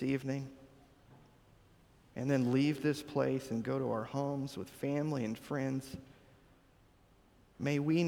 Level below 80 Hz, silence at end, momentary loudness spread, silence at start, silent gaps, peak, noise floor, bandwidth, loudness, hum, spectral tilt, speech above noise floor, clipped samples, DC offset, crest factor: -68 dBFS; 0 s; 11 LU; 0 s; none; -18 dBFS; -65 dBFS; 17.5 kHz; -36 LUFS; none; -7 dB/octave; 31 dB; under 0.1%; under 0.1%; 18 dB